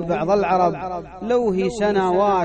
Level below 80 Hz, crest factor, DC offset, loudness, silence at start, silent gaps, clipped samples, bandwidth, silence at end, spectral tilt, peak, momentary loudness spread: -46 dBFS; 12 dB; under 0.1%; -20 LUFS; 0 s; none; under 0.1%; 9.2 kHz; 0 s; -6.5 dB/octave; -6 dBFS; 11 LU